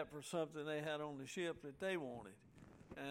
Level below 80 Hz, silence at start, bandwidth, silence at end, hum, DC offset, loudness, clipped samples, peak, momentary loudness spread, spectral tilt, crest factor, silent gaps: -76 dBFS; 0 s; 16 kHz; 0 s; none; under 0.1%; -46 LUFS; under 0.1%; -30 dBFS; 17 LU; -4.5 dB/octave; 18 dB; none